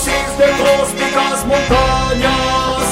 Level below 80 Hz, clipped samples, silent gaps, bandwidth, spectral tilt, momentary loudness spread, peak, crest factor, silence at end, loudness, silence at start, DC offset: -26 dBFS; under 0.1%; none; 16 kHz; -3.5 dB/octave; 3 LU; -2 dBFS; 12 dB; 0 s; -14 LUFS; 0 s; under 0.1%